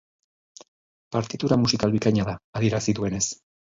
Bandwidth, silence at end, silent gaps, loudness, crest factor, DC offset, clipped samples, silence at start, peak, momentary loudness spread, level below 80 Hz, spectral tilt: 7.8 kHz; 0.35 s; 2.44-2.53 s; -24 LUFS; 20 dB; under 0.1%; under 0.1%; 1.1 s; -6 dBFS; 8 LU; -50 dBFS; -5 dB/octave